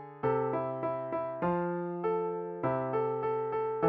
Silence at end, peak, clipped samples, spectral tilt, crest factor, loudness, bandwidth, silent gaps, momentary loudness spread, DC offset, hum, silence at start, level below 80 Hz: 0 s; -16 dBFS; under 0.1%; -8 dB/octave; 16 dB; -33 LUFS; 4.6 kHz; none; 3 LU; under 0.1%; none; 0 s; -68 dBFS